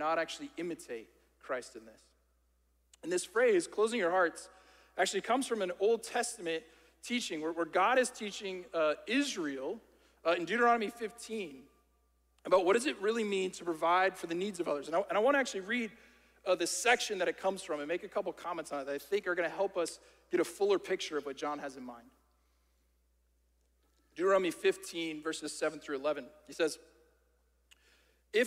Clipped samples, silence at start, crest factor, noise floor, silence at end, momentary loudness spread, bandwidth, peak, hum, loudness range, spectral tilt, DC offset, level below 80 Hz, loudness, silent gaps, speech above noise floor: under 0.1%; 0 s; 20 dB; -73 dBFS; 0 s; 14 LU; 16 kHz; -14 dBFS; none; 6 LU; -3 dB/octave; under 0.1%; -74 dBFS; -33 LUFS; none; 40 dB